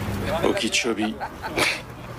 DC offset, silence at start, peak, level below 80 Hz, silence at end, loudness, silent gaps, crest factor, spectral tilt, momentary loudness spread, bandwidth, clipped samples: under 0.1%; 0 s; -10 dBFS; -42 dBFS; 0 s; -24 LUFS; none; 16 dB; -3.5 dB/octave; 8 LU; 16 kHz; under 0.1%